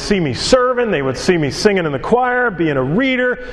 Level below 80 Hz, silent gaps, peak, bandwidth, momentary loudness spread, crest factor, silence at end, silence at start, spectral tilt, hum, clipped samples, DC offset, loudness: -38 dBFS; none; 0 dBFS; 12 kHz; 4 LU; 16 dB; 0 s; 0 s; -5 dB/octave; none; under 0.1%; under 0.1%; -15 LUFS